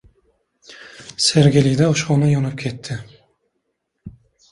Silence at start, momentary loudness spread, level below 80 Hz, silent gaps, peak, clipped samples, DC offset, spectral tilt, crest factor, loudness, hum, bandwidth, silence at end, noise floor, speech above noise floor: 0.7 s; 20 LU; -50 dBFS; none; -2 dBFS; under 0.1%; under 0.1%; -5.5 dB/octave; 18 dB; -17 LUFS; none; 11 kHz; 0.4 s; -73 dBFS; 57 dB